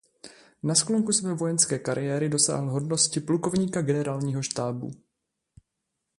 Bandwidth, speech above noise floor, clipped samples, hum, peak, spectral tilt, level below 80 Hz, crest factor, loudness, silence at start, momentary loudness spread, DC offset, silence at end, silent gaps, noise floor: 11.5 kHz; 56 dB; under 0.1%; none; -6 dBFS; -4 dB/octave; -64 dBFS; 22 dB; -25 LUFS; 0.25 s; 7 LU; under 0.1%; 1.25 s; none; -82 dBFS